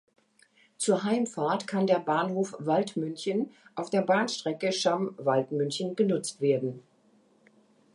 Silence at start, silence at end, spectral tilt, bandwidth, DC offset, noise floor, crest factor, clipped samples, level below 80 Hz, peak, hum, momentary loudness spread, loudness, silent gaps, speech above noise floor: 0.8 s; 1.15 s; -5 dB/octave; 11.5 kHz; under 0.1%; -64 dBFS; 18 dB; under 0.1%; -80 dBFS; -12 dBFS; none; 6 LU; -28 LUFS; none; 36 dB